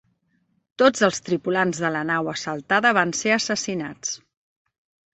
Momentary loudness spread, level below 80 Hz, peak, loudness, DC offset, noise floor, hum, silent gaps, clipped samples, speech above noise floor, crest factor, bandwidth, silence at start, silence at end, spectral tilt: 11 LU; -64 dBFS; -4 dBFS; -22 LUFS; under 0.1%; -68 dBFS; none; none; under 0.1%; 46 dB; 20 dB; 8.4 kHz; 0.8 s; 0.95 s; -3.5 dB/octave